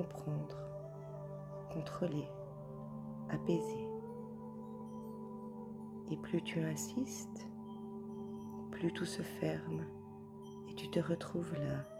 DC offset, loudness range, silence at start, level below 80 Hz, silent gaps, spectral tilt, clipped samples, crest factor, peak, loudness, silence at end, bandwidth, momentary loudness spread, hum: under 0.1%; 2 LU; 0 s; -70 dBFS; none; -6 dB/octave; under 0.1%; 20 dB; -22 dBFS; -43 LUFS; 0 s; 16 kHz; 11 LU; none